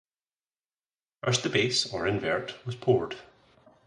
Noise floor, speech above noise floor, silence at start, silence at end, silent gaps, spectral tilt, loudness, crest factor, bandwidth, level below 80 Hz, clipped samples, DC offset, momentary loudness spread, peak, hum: under -90 dBFS; over 62 dB; 1.25 s; 0.6 s; none; -4 dB/octave; -28 LUFS; 20 dB; 11 kHz; -60 dBFS; under 0.1%; under 0.1%; 12 LU; -10 dBFS; none